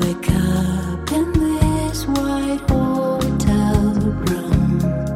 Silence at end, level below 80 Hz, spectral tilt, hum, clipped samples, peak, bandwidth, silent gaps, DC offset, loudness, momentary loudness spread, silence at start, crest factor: 0 s; -26 dBFS; -6.5 dB/octave; none; under 0.1%; -2 dBFS; 16.5 kHz; none; under 0.1%; -19 LUFS; 4 LU; 0 s; 16 dB